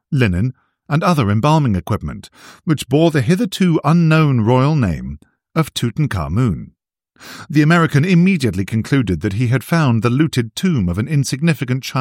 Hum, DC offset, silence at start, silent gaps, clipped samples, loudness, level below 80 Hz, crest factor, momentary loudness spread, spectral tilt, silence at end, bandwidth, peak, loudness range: none; under 0.1%; 0.1 s; none; under 0.1%; -16 LUFS; -40 dBFS; 16 dB; 10 LU; -6.5 dB/octave; 0 s; 16.5 kHz; 0 dBFS; 3 LU